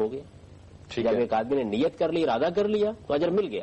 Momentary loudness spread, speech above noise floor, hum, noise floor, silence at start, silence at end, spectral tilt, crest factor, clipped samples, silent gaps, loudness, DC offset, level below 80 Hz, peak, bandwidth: 5 LU; 23 dB; none; -48 dBFS; 0 s; 0 s; -7 dB/octave; 10 dB; under 0.1%; none; -26 LUFS; under 0.1%; -56 dBFS; -16 dBFS; 8.6 kHz